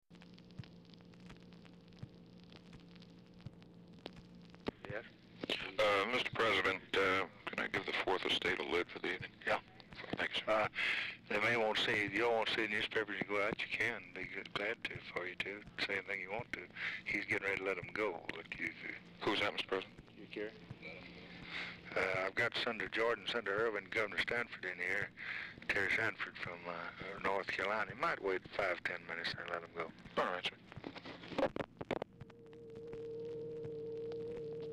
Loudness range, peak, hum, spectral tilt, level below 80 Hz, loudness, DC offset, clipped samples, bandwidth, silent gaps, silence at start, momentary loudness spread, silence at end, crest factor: 10 LU; -26 dBFS; none; -4 dB/octave; -68 dBFS; -38 LUFS; under 0.1%; under 0.1%; 15.5 kHz; none; 0.1 s; 21 LU; 0 s; 14 dB